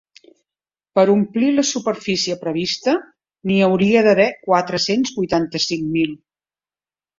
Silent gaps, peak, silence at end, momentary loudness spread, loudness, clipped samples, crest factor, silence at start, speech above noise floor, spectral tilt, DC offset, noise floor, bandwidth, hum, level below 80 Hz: none; -2 dBFS; 1.05 s; 8 LU; -18 LUFS; under 0.1%; 18 dB; 0.95 s; over 73 dB; -4.5 dB/octave; under 0.1%; under -90 dBFS; 7.6 kHz; none; -58 dBFS